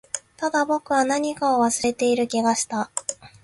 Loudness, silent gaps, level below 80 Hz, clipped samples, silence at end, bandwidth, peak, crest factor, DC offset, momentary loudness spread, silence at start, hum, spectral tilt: -22 LUFS; none; -62 dBFS; under 0.1%; 0.15 s; 11.5 kHz; -6 dBFS; 16 dB; under 0.1%; 7 LU; 0.15 s; none; -2.5 dB/octave